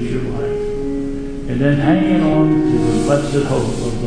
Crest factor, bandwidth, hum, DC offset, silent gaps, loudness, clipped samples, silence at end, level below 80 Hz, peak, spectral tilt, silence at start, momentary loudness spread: 14 dB; 10.5 kHz; none; under 0.1%; none; -17 LUFS; under 0.1%; 0 s; -28 dBFS; -2 dBFS; -7 dB/octave; 0 s; 9 LU